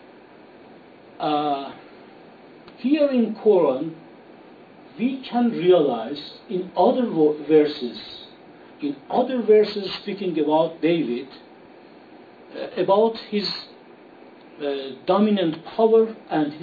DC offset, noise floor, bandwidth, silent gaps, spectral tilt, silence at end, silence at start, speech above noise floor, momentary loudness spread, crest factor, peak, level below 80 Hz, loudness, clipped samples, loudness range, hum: under 0.1%; -47 dBFS; 4.9 kHz; none; -8 dB/octave; 0 s; 0.7 s; 26 dB; 15 LU; 18 dB; -4 dBFS; -72 dBFS; -22 LUFS; under 0.1%; 5 LU; none